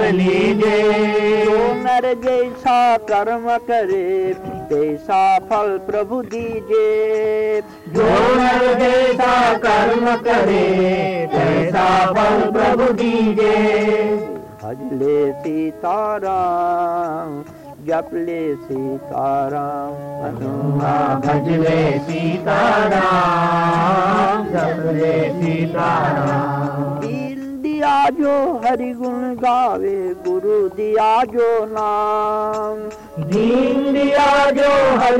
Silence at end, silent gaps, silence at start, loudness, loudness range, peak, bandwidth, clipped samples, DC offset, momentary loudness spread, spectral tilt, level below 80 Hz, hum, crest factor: 0 s; none; 0 s; -17 LUFS; 6 LU; -10 dBFS; 15.5 kHz; under 0.1%; under 0.1%; 10 LU; -6.5 dB/octave; -46 dBFS; none; 6 dB